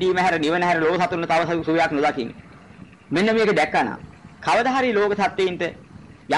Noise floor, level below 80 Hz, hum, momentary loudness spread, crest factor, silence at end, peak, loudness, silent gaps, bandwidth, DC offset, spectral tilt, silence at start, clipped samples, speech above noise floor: -45 dBFS; -54 dBFS; none; 10 LU; 10 dB; 0 s; -10 dBFS; -21 LUFS; none; 11.5 kHz; 0.1%; -5.5 dB/octave; 0 s; under 0.1%; 24 dB